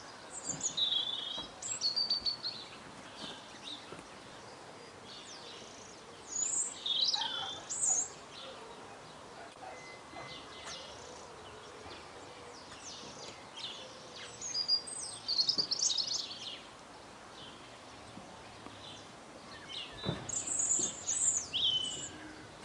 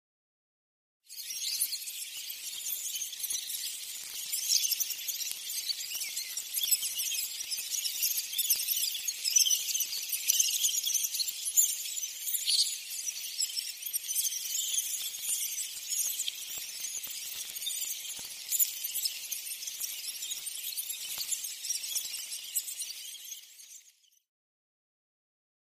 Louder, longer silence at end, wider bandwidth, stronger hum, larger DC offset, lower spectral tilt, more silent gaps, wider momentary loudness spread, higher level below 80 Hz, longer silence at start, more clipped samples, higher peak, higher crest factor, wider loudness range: second, -34 LUFS vs -31 LUFS; second, 0 s vs 1.85 s; second, 12 kHz vs 15.5 kHz; neither; neither; first, 0 dB/octave vs 5 dB/octave; neither; first, 20 LU vs 11 LU; first, -70 dBFS vs -84 dBFS; second, 0 s vs 1.1 s; neither; second, -18 dBFS vs -8 dBFS; about the same, 22 dB vs 26 dB; first, 14 LU vs 8 LU